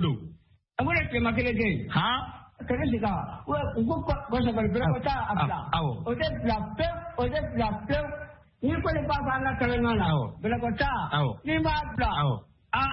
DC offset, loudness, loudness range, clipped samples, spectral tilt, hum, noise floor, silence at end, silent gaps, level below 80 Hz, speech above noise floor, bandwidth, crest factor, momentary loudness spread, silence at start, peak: under 0.1%; -28 LUFS; 2 LU; under 0.1%; -10.5 dB/octave; none; -54 dBFS; 0 s; none; -42 dBFS; 26 dB; 5.8 kHz; 16 dB; 6 LU; 0 s; -12 dBFS